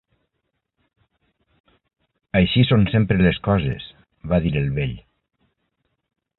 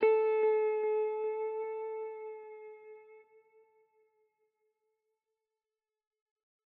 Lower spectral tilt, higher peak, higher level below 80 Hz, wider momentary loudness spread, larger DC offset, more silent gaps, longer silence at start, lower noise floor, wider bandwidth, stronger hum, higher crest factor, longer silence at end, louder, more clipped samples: first, -11.5 dB/octave vs -1.5 dB/octave; first, -4 dBFS vs -16 dBFS; first, -38 dBFS vs under -90 dBFS; second, 17 LU vs 22 LU; neither; neither; first, 2.35 s vs 0 s; second, -76 dBFS vs under -90 dBFS; about the same, 4.3 kHz vs 4.2 kHz; neither; about the same, 18 dB vs 20 dB; second, 1.4 s vs 3.55 s; first, -20 LUFS vs -33 LUFS; neither